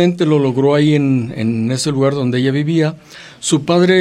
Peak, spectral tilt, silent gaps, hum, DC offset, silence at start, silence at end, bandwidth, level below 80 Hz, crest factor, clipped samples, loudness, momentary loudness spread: -2 dBFS; -6 dB/octave; none; none; under 0.1%; 0 s; 0 s; 12.5 kHz; -58 dBFS; 12 dB; under 0.1%; -15 LUFS; 6 LU